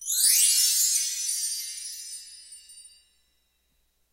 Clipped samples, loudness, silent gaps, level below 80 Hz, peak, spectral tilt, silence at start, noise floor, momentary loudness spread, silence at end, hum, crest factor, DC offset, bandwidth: under 0.1%; -21 LUFS; none; -72 dBFS; -8 dBFS; 7 dB/octave; 0 s; -71 dBFS; 20 LU; 1.25 s; none; 20 dB; under 0.1%; 16 kHz